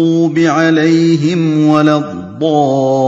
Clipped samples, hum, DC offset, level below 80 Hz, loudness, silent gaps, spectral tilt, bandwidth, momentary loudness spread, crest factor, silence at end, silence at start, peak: 0.1%; none; under 0.1%; -56 dBFS; -11 LUFS; none; -7 dB/octave; 7.8 kHz; 5 LU; 10 dB; 0 s; 0 s; 0 dBFS